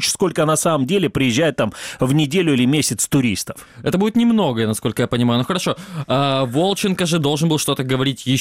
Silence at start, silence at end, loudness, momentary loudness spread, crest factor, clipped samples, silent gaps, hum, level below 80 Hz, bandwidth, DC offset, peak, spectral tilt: 0 s; 0 s; -18 LUFS; 6 LU; 12 dB; under 0.1%; none; none; -50 dBFS; 16 kHz; under 0.1%; -6 dBFS; -4.5 dB/octave